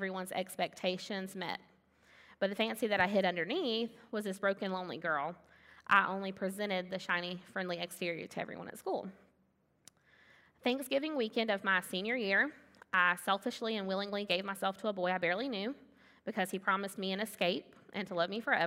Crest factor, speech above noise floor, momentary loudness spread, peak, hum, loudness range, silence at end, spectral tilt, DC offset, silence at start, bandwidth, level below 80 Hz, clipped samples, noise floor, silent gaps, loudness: 24 dB; 39 dB; 11 LU; -12 dBFS; none; 6 LU; 0 s; -4.5 dB/octave; under 0.1%; 0 s; 16 kHz; -80 dBFS; under 0.1%; -74 dBFS; none; -35 LUFS